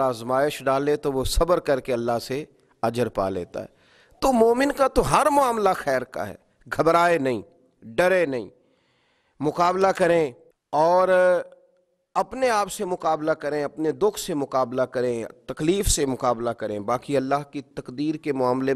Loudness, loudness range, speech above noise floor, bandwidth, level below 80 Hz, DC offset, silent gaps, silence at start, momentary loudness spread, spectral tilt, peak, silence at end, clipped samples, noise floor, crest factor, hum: -23 LUFS; 4 LU; 43 dB; 14.5 kHz; -40 dBFS; under 0.1%; none; 0 s; 13 LU; -4.5 dB/octave; -2 dBFS; 0 s; under 0.1%; -66 dBFS; 20 dB; none